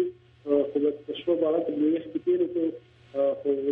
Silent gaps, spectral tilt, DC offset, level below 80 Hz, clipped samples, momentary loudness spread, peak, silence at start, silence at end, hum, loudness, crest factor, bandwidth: none; -9 dB/octave; under 0.1%; -70 dBFS; under 0.1%; 8 LU; -12 dBFS; 0 s; 0 s; none; -27 LUFS; 14 dB; 4 kHz